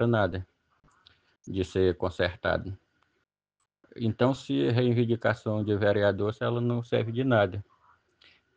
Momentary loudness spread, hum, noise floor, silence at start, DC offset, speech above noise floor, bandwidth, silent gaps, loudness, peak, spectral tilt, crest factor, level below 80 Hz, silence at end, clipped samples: 9 LU; none; -82 dBFS; 0 s; under 0.1%; 55 dB; 8 kHz; none; -28 LUFS; -10 dBFS; -8 dB/octave; 20 dB; -56 dBFS; 0.95 s; under 0.1%